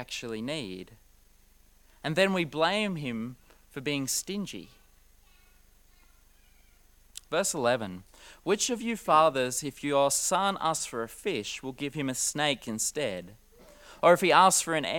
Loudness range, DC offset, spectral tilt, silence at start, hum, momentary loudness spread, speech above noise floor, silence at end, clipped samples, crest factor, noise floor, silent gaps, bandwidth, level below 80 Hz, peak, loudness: 10 LU; under 0.1%; -3 dB/octave; 0 s; 50 Hz at -65 dBFS; 17 LU; 32 dB; 0 s; under 0.1%; 22 dB; -60 dBFS; none; 18 kHz; -60 dBFS; -6 dBFS; -28 LUFS